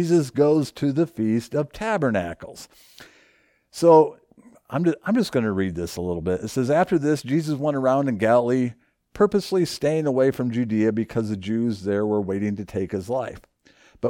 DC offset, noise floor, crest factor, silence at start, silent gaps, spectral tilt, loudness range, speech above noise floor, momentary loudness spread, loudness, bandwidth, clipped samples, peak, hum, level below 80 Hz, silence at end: under 0.1%; -61 dBFS; 18 dB; 0 s; none; -7 dB/octave; 3 LU; 39 dB; 9 LU; -22 LUFS; 18 kHz; under 0.1%; -4 dBFS; none; -54 dBFS; 0 s